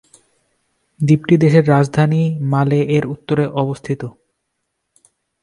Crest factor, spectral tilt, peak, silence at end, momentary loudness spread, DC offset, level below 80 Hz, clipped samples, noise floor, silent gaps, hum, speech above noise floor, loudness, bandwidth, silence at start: 16 dB; -8 dB/octave; 0 dBFS; 1.3 s; 12 LU; under 0.1%; -54 dBFS; under 0.1%; -73 dBFS; none; none; 59 dB; -16 LUFS; 11 kHz; 1 s